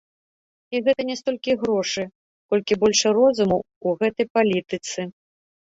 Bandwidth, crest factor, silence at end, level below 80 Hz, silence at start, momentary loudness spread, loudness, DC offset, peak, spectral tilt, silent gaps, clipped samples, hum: 8 kHz; 16 dB; 0.55 s; -60 dBFS; 0.7 s; 11 LU; -22 LUFS; under 0.1%; -6 dBFS; -4 dB/octave; 2.15-2.49 s, 3.76-3.81 s, 4.30-4.35 s; under 0.1%; none